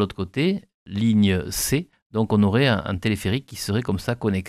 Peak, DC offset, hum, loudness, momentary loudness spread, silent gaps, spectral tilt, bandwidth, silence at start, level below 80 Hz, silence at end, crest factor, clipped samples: -6 dBFS; under 0.1%; none; -23 LUFS; 8 LU; 0.74-0.86 s, 2.02-2.10 s; -5.5 dB/octave; 15.5 kHz; 0 s; -46 dBFS; 0 s; 16 dB; under 0.1%